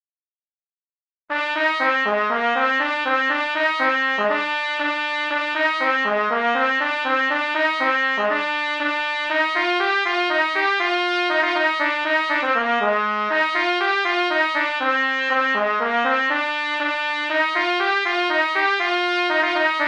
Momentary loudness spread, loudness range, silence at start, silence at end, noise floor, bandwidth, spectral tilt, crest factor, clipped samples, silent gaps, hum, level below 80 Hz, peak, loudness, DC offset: 3 LU; 1 LU; 1.3 s; 0 s; under -90 dBFS; 9.8 kHz; -2.5 dB/octave; 16 dB; under 0.1%; none; none; -70 dBFS; -4 dBFS; -20 LUFS; under 0.1%